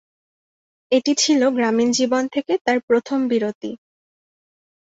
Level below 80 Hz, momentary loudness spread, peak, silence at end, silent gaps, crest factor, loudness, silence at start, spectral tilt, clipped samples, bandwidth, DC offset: -66 dBFS; 9 LU; -4 dBFS; 1.1 s; 2.61-2.65 s, 2.83-2.88 s, 3.55-3.61 s; 18 dB; -19 LUFS; 0.9 s; -3 dB/octave; under 0.1%; 8 kHz; under 0.1%